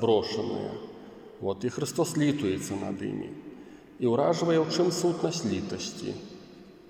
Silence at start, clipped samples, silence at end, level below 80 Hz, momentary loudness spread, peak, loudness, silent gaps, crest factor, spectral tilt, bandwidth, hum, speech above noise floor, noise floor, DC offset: 0 s; under 0.1%; 0.05 s; -66 dBFS; 21 LU; -12 dBFS; -29 LUFS; none; 18 dB; -5.5 dB/octave; 16.5 kHz; none; 22 dB; -50 dBFS; under 0.1%